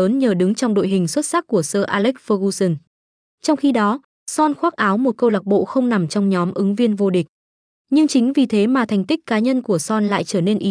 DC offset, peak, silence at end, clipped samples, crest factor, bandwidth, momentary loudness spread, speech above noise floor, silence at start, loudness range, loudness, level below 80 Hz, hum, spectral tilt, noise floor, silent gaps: under 0.1%; -4 dBFS; 0 s; under 0.1%; 14 dB; 10.5 kHz; 4 LU; over 73 dB; 0 s; 2 LU; -18 LUFS; -68 dBFS; none; -5.5 dB/octave; under -90 dBFS; 2.87-3.38 s, 4.04-4.26 s, 7.29-7.85 s